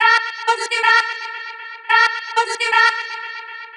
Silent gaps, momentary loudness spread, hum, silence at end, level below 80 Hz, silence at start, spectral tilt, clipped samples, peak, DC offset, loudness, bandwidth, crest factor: none; 15 LU; none; 0 s; under -90 dBFS; 0 s; 4 dB/octave; under 0.1%; -2 dBFS; under 0.1%; -16 LUFS; 11.5 kHz; 18 dB